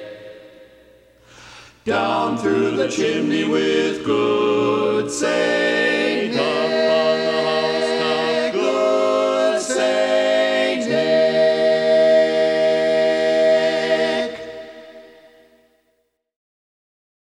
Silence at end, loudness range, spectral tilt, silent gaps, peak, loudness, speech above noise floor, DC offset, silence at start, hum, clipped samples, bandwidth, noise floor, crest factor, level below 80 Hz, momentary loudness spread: 2.25 s; 6 LU; -4 dB/octave; none; -6 dBFS; -18 LUFS; 50 dB; under 0.1%; 0 s; 60 Hz at -50 dBFS; under 0.1%; 11 kHz; -68 dBFS; 14 dB; -60 dBFS; 5 LU